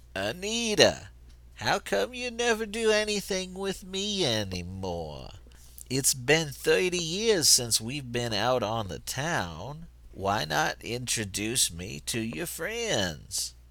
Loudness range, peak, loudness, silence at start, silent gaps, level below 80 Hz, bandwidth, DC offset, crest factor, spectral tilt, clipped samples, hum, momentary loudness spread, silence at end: 5 LU; -4 dBFS; -27 LUFS; 0.15 s; none; -50 dBFS; over 20 kHz; under 0.1%; 26 dB; -2.5 dB/octave; under 0.1%; none; 13 LU; 0.05 s